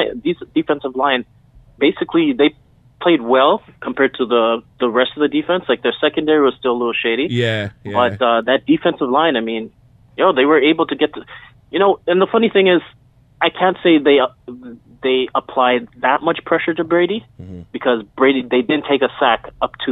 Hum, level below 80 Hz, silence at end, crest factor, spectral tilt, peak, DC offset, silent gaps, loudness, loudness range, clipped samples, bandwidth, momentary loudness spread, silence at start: none; -54 dBFS; 0 s; 16 dB; -7 dB/octave; 0 dBFS; under 0.1%; none; -16 LUFS; 2 LU; under 0.1%; 7.8 kHz; 9 LU; 0 s